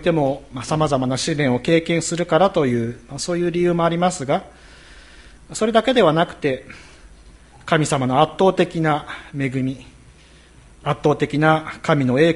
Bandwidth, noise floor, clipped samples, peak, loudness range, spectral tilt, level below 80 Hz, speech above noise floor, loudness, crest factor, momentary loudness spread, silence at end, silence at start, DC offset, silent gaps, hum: 11.5 kHz; -47 dBFS; under 0.1%; 0 dBFS; 3 LU; -5.5 dB/octave; -48 dBFS; 29 dB; -19 LUFS; 20 dB; 11 LU; 0 s; 0 s; under 0.1%; none; none